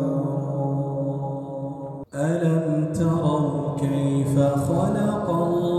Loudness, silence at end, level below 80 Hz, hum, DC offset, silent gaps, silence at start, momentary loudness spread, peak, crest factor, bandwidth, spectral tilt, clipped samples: -24 LUFS; 0 s; -54 dBFS; none; under 0.1%; none; 0 s; 10 LU; -8 dBFS; 14 dB; 13 kHz; -8 dB/octave; under 0.1%